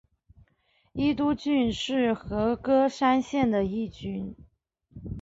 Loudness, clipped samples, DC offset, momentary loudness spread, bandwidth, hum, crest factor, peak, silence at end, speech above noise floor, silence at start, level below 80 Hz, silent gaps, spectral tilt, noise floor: -26 LUFS; under 0.1%; under 0.1%; 14 LU; 7.8 kHz; none; 16 dB; -10 dBFS; 0 s; 43 dB; 0.95 s; -50 dBFS; none; -6 dB/octave; -69 dBFS